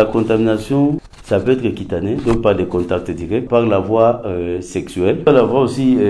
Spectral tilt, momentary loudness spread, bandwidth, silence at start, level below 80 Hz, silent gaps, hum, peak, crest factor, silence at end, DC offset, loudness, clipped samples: -7.5 dB/octave; 9 LU; 11 kHz; 0 s; -38 dBFS; none; none; 0 dBFS; 16 dB; 0 s; under 0.1%; -16 LUFS; under 0.1%